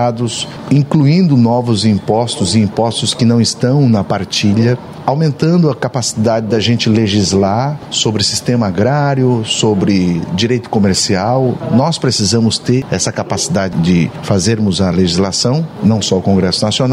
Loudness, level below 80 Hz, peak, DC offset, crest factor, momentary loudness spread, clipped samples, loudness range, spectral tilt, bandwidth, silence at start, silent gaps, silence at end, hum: -13 LUFS; -44 dBFS; 0 dBFS; under 0.1%; 12 dB; 4 LU; under 0.1%; 1 LU; -5 dB/octave; 12.5 kHz; 0 s; none; 0 s; none